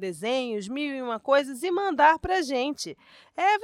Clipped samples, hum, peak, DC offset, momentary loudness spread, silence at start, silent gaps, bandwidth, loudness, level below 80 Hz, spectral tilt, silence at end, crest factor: under 0.1%; none; -6 dBFS; under 0.1%; 11 LU; 0 s; none; 15.5 kHz; -25 LUFS; -56 dBFS; -3.5 dB/octave; 0 s; 18 dB